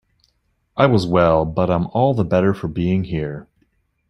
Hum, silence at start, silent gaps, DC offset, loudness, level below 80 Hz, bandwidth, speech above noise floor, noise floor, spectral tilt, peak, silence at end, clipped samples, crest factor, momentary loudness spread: none; 0.75 s; none; under 0.1%; -18 LUFS; -44 dBFS; 11 kHz; 49 dB; -66 dBFS; -8.5 dB/octave; -2 dBFS; 0.65 s; under 0.1%; 18 dB; 11 LU